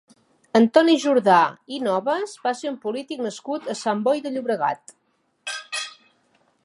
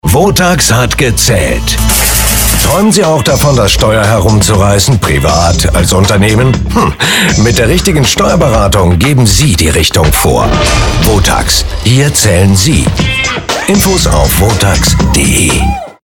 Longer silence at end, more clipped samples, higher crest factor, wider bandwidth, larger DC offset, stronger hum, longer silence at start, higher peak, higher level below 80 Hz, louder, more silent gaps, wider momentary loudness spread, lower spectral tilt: first, 0.75 s vs 0.1 s; neither; first, 20 dB vs 8 dB; second, 11.5 kHz vs 19 kHz; neither; neither; first, 0.55 s vs 0.05 s; about the same, -2 dBFS vs 0 dBFS; second, -76 dBFS vs -16 dBFS; second, -22 LUFS vs -8 LUFS; neither; first, 13 LU vs 3 LU; about the same, -4.5 dB/octave vs -4 dB/octave